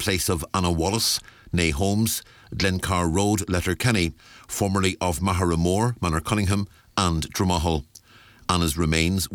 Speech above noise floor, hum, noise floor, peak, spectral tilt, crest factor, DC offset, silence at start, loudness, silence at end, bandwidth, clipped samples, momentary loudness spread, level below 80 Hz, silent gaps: 28 dB; none; -52 dBFS; -4 dBFS; -4.5 dB/octave; 20 dB; under 0.1%; 0 s; -24 LUFS; 0 s; 20 kHz; under 0.1%; 5 LU; -38 dBFS; none